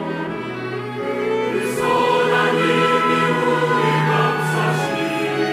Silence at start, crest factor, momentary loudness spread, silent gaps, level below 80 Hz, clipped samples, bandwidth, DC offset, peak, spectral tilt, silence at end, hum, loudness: 0 s; 14 dB; 9 LU; none; -58 dBFS; under 0.1%; 16 kHz; under 0.1%; -4 dBFS; -5.5 dB/octave; 0 s; none; -18 LUFS